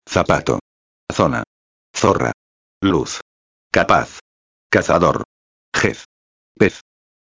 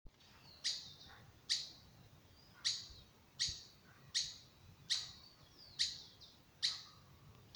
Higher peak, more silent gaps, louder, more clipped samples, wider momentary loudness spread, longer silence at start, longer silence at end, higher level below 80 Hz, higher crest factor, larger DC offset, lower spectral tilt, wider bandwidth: first, 0 dBFS vs -22 dBFS; first, 0.61-1.07 s, 1.47-1.94 s, 2.34-2.81 s, 3.22-3.70 s, 4.21-4.70 s, 5.25-5.72 s, 6.05-6.55 s vs none; first, -18 LUFS vs -41 LUFS; neither; second, 15 LU vs 23 LU; about the same, 0.1 s vs 0.05 s; first, 0.6 s vs 0 s; first, -42 dBFS vs -70 dBFS; about the same, 20 dB vs 24 dB; neither; first, -5 dB/octave vs 0.5 dB/octave; second, 8 kHz vs over 20 kHz